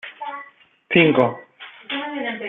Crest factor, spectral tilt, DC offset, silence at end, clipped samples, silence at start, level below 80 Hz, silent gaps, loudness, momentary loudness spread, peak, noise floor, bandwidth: 20 dB; -8.5 dB/octave; under 0.1%; 0 s; under 0.1%; 0.05 s; -64 dBFS; none; -19 LUFS; 22 LU; -2 dBFS; -46 dBFS; 4.2 kHz